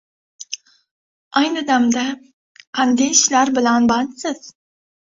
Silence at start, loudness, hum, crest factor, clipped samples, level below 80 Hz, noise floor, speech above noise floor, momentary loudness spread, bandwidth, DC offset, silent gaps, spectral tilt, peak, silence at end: 0.4 s; -17 LUFS; none; 18 dB; under 0.1%; -60 dBFS; -36 dBFS; 19 dB; 18 LU; 8 kHz; under 0.1%; 0.91-1.31 s, 2.33-2.55 s, 2.67-2.73 s; -1.5 dB/octave; -2 dBFS; 0.55 s